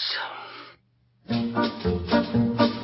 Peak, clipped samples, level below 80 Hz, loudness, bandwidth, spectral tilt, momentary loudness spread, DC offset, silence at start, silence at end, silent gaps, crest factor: -6 dBFS; under 0.1%; -44 dBFS; -25 LUFS; 5.8 kHz; -10 dB/octave; 16 LU; under 0.1%; 0 s; 0 s; none; 20 dB